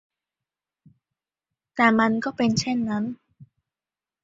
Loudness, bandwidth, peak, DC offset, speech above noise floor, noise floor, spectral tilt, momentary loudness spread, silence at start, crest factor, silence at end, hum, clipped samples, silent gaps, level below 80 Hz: -23 LUFS; 7.8 kHz; -4 dBFS; under 0.1%; over 68 dB; under -90 dBFS; -5 dB/octave; 15 LU; 1.75 s; 24 dB; 0.8 s; none; under 0.1%; none; -62 dBFS